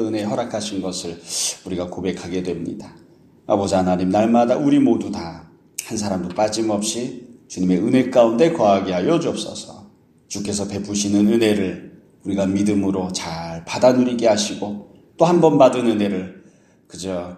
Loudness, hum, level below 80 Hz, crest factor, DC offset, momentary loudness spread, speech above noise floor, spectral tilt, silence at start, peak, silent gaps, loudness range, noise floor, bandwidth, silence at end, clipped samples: -19 LUFS; none; -56 dBFS; 20 dB; under 0.1%; 16 LU; 32 dB; -5 dB/octave; 0 s; 0 dBFS; none; 5 LU; -51 dBFS; 14.5 kHz; 0 s; under 0.1%